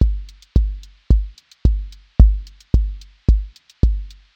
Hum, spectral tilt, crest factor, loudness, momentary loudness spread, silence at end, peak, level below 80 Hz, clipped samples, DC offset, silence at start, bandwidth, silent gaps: none; -9 dB/octave; 18 dB; -21 LUFS; 14 LU; 0.25 s; 0 dBFS; -18 dBFS; under 0.1%; under 0.1%; 0 s; 5.6 kHz; none